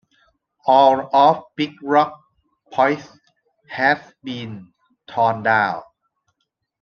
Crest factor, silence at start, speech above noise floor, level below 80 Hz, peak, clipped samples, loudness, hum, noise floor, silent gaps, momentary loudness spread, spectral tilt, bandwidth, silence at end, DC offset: 20 dB; 0.65 s; 57 dB; -68 dBFS; -2 dBFS; under 0.1%; -18 LUFS; none; -75 dBFS; none; 17 LU; -6 dB/octave; 6.8 kHz; 1 s; under 0.1%